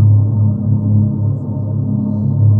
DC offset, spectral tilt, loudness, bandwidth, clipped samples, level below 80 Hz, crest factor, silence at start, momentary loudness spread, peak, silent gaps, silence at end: under 0.1%; -15 dB/octave; -15 LUFS; 1.3 kHz; under 0.1%; -42 dBFS; 10 dB; 0 s; 6 LU; -2 dBFS; none; 0 s